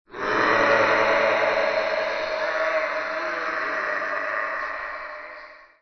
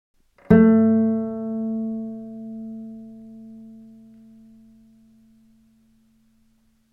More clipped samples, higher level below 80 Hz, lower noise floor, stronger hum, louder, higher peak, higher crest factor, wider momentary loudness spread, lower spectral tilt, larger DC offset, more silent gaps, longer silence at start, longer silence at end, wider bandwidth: neither; about the same, -58 dBFS vs -56 dBFS; second, -44 dBFS vs -62 dBFS; neither; second, -23 LUFS vs -19 LUFS; about the same, -6 dBFS vs -4 dBFS; about the same, 18 dB vs 22 dB; second, 14 LU vs 27 LU; second, -3.5 dB/octave vs -11.5 dB/octave; neither; neither; second, 0.1 s vs 0.5 s; second, 0.15 s vs 3.1 s; first, 6.4 kHz vs 3 kHz